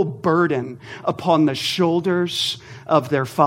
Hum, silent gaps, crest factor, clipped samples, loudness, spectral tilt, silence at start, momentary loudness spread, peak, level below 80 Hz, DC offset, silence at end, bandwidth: none; none; 18 dB; under 0.1%; -20 LUFS; -5.5 dB/octave; 0 s; 9 LU; -2 dBFS; -62 dBFS; under 0.1%; 0 s; 16.5 kHz